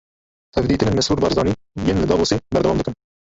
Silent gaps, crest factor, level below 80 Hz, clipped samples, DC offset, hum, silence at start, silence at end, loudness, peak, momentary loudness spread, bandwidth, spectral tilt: none; 18 dB; -36 dBFS; under 0.1%; under 0.1%; none; 0.55 s; 0.3 s; -19 LUFS; -2 dBFS; 5 LU; 8 kHz; -5.5 dB/octave